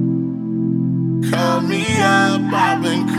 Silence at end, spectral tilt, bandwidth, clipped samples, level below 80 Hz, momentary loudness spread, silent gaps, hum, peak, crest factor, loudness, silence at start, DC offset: 0 s; -5.5 dB/octave; 14.5 kHz; under 0.1%; -54 dBFS; 6 LU; none; none; -2 dBFS; 14 dB; -17 LUFS; 0 s; under 0.1%